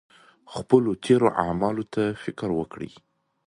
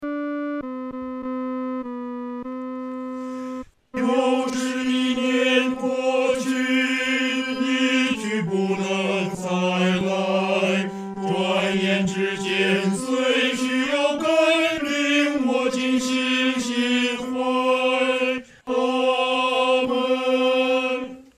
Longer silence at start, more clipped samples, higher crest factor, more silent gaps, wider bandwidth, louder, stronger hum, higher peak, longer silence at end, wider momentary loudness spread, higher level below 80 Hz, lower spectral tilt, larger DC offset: first, 0.5 s vs 0 s; neither; first, 22 dB vs 16 dB; neither; second, 11.5 kHz vs 14 kHz; about the same, -24 LUFS vs -22 LUFS; neither; about the same, -4 dBFS vs -6 dBFS; first, 0.6 s vs 0.15 s; first, 17 LU vs 12 LU; first, -54 dBFS vs -62 dBFS; first, -7 dB/octave vs -4.5 dB/octave; neither